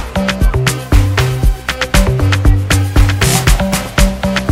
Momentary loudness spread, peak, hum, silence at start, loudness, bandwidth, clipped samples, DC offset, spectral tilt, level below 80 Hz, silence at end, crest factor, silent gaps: 5 LU; 0 dBFS; none; 0 s; -13 LUFS; 16.5 kHz; under 0.1%; under 0.1%; -4.5 dB/octave; -16 dBFS; 0 s; 12 dB; none